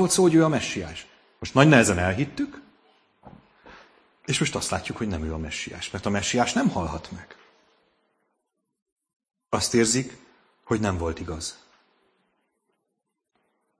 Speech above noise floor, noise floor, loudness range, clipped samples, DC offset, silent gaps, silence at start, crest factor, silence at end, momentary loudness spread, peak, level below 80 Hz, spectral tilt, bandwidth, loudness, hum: 57 dB; -80 dBFS; 8 LU; under 0.1%; under 0.1%; 8.82-8.86 s, 8.92-8.96 s, 9.16-9.20 s; 0 s; 24 dB; 2.25 s; 18 LU; -2 dBFS; -48 dBFS; -4.5 dB/octave; 11 kHz; -24 LUFS; none